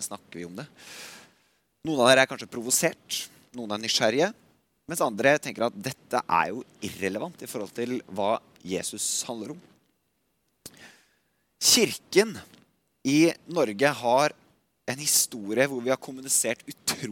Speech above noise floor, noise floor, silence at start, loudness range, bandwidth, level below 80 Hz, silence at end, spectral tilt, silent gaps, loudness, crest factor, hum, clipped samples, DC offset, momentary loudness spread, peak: 47 dB; -74 dBFS; 0 s; 7 LU; 17.5 kHz; -72 dBFS; 0 s; -2.5 dB/octave; none; -25 LUFS; 24 dB; none; under 0.1%; under 0.1%; 19 LU; -4 dBFS